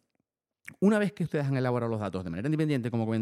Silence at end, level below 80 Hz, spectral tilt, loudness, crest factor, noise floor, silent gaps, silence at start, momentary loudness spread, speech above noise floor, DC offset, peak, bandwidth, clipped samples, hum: 0 s; -68 dBFS; -8 dB/octave; -29 LUFS; 16 dB; -81 dBFS; none; 0.65 s; 7 LU; 53 dB; under 0.1%; -14 dBFS; 14 kHz; under 0.1%; none